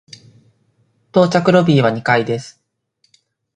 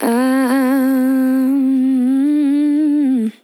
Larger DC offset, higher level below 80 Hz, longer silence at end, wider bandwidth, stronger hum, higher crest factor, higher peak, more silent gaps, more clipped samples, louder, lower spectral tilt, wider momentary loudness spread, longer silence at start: neither; first, -58 dBFS vs under -90 dBFS; first, 1.05 s vs 0.15 s; second, 9.8 kHz vs 13.5 kHz; neither; first, 18 dB vs 10 dB; first, 0 dBFS vs -4 dBFS; neither; neither; about the same, -15 LUFS vs -15 LUFS; first, -6.5 dB/octave vs -5 dB/octave; first, 9 LU vs 0 LU; first, 1.15 s vs 0 s